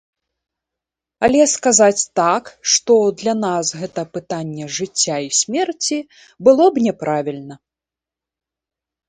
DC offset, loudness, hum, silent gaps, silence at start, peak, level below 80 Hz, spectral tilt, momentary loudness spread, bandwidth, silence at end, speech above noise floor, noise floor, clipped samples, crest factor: under 0.1%; -17 LUFS; none; none; 1.2 s; 0 dBFS; -56 dBFS; -3 dB/octave; 13 LU; 9.8 kHz; 1.5 s; 71 dB; -88 dBFS; under 0.1%; 18 dB